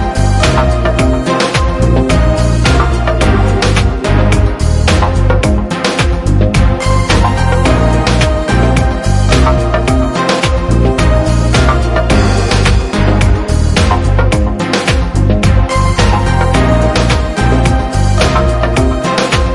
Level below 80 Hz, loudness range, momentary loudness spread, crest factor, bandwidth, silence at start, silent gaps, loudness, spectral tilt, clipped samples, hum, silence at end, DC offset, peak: -14 dBFS; 1 LU; 2 LU; 10 dB; 11.5 kHz; 0 s; none; -11 LUFS; -5.5 dB/octave; under 0.1%; none; 0 s; 0.3%; 0 dBFS